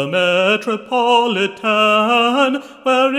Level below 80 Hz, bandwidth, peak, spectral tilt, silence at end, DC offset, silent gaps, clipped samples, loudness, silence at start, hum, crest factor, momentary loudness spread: -70 dBFS; 14 kHz; -2 dBFS; -4 dB/octave; 0 s; under 0.1%; none; under 0.1%; -15 LUFS; 0 s; none; 14 dB; 5 LU